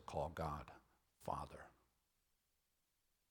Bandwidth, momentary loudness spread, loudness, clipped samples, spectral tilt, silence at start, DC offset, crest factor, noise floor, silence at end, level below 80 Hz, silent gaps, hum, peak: 18 kHz; 18 LU; -48 LUFS; under 0.1%; -6.5 dB/octave; 0 s; under 0.1%; 22 dB; -85 dBFS; 1.6 s; -66 dBFS; none; none; -30 dBFS